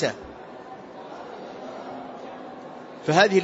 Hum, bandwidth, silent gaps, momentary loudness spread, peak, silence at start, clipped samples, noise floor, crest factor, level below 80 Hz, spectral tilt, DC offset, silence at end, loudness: none; 8 kHz; none; 20 LU; -4 dBFS; 0 s; under 0.1%; -41 dBFS; 24 dB; -64 dBFS; -4.5 dB/octave; under 0.1%; 0 s; -28 LUFS